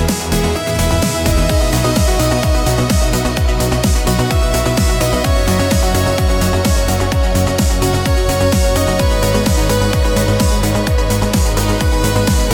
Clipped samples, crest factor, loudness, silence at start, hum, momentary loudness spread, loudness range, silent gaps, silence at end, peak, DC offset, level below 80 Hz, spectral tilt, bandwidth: under 0.1%; 10 dB; -14 LUFS; 0 s; none; 2 LU; 0 LU; none; 0 s; -2 dBFS; under 0.1%; -18 dBFS; -5 dB/octave; 18 kHz